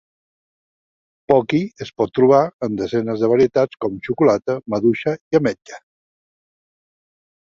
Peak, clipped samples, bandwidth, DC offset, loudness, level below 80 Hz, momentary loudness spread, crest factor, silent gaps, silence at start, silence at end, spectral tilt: -2 dBFS; under 0.1%; 7.4 kHz; under 0.1%; -18 LUFS; -56 dBFS; 9 LU; 18 dB; 2.53-2.59 s, 5.21-5.31 s; 1.3 s; 1.65 s; -7.5 dB/octave